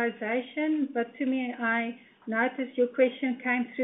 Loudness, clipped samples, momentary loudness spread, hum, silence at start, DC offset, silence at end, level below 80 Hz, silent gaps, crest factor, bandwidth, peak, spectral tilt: -29 LUFS; under 0.1%; 5 LU; none; 0 s; under 0.1%; 0 s; -82 dBFS; none; 18 dB; 3.9 kHz; -12 dBFS; -8.5 dB/octave